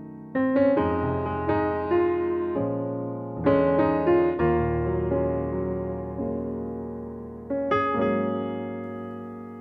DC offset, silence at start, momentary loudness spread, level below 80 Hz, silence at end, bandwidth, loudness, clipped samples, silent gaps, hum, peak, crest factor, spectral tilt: under 0.1%; 0 s; 13 LU; -44 dBFS; 0 s; 5 kHz; -26 LUFS; under 0.1%; none; none; -8 dBFS; 16 dB; -10.5 dB/octave